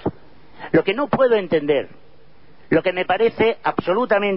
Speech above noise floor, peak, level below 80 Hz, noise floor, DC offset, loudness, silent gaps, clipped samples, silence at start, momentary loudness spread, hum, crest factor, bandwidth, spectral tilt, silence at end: 34 dB; -4 dBFS; -52 dBFS; -52 dBFS; 0.8%; -19 LUFS; none; under 0.1%; 0.05 s; 6 LU; none; 14 dB; 5.6 kHz; -10.5 dB/octave; 0 s